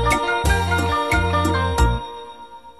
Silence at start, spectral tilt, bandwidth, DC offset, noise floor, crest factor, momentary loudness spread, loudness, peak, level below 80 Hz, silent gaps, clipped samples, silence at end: 0 s; -5 dB/octave; 13.5 kHz; 0.4%; -40 dBFS; 14 dB; 17 LU; -20 LUFS; -6 dBFS; -26 dBFS; none; under 0.1%; 0.1 s